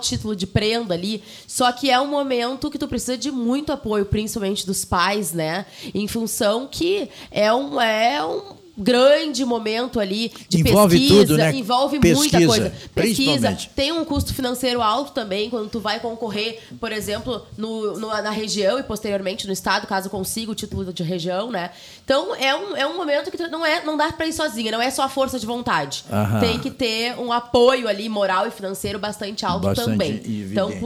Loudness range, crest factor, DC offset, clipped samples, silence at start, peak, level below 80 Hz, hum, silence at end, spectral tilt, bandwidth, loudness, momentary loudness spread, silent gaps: 8 LU; 16 dB; under 0.1%; under 0.1%; 0 s; -4 dBFS; -44 dBFS; none; 0 s; -4.5 dB/octave; 19 kHz; -21 LUFS; 11 LU; none